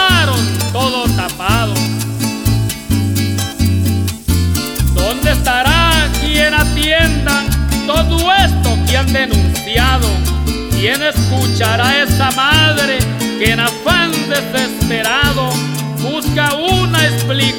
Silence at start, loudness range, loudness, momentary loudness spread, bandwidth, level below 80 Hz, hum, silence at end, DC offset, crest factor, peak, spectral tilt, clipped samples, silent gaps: 0 s; 3 LU; -13 LUFS; 6 LU; over 20 kHz; -22 dBFS; none; 0 s; under 0.1%; 12 dB; 0 dBFS; -4 dB/octave; under 0.1%; none